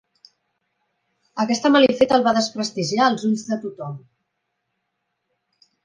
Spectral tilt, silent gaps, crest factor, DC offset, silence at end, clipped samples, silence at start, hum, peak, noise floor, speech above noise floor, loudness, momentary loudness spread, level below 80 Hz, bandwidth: -4.5 dB/octave; none; 20 dB; under 0.1%; 1.85 s; under 0.1%; 1.35 s; none; -2 dBFS; -76 dBFS; 57 dB; -19 LUFS; 18 LU; -64 dBFS; 10 kHz